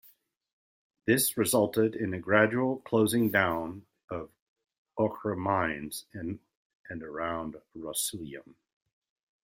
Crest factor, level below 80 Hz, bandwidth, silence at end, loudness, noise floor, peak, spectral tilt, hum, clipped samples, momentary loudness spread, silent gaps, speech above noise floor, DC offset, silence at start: 24 dB; -64 dBFS; 16 kHz; 0.9 s; -29 LUFS; -63 dBFS; -6 dBFS; -4.5 dB/octave; none; under 0.1%; 18 LU; 4.04-4.08 s, 4.41-4.56 s, 4.78-4.86 s, 6.55-6.84 s; 34 dB; under 0.1%; 1.05 s